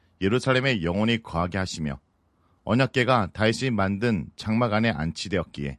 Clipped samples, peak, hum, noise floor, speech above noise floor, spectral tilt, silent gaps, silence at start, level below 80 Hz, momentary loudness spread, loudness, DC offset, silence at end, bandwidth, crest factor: under 0.1%; -4 dBFS; none; -65 dBFS; 41 dB; -6 dB/octave; none; 0.2 s; -44 dBFS; 8 LU; -25 LUFS; under 0.1%; 0 s; 11.5 kHz; 20 dB